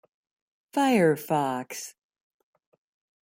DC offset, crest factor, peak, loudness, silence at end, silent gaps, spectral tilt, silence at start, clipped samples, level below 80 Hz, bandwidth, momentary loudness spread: under 0.1%; 18 dB; -10 dBFS; -25 LUFS; 1.35 s; none; -5.5 dB/octave; 0.75 s; under 0.1%; -74 dBFS; 16.5 kHz; 16 LU